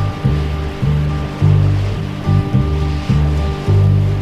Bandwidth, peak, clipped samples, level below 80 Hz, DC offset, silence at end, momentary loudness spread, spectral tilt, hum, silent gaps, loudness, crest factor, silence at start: 8.2 kHz; -2 dBFS; under 0.1%; -22 dBFS; under 0.1%; 0 s; 6 LU; -8 dB/octave; none; none; -16 LUFS; 12 dB; 0 s